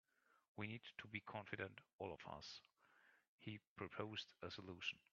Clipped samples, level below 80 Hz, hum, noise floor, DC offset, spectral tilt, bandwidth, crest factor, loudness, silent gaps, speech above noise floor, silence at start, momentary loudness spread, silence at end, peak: under 0.1%; -84 dBFS; none; -75 dBFS; under 0.1%; -3 dB/octave; 7.2 kHz; 24 dB; -53 LUFS; 0.48-0.55 s, 1.93-1.99 s, 3.28-3.38 s, 3.67-3.76 s; 22 dB; 0.3 s; 7 LU; 0.15 s; -30 dBFS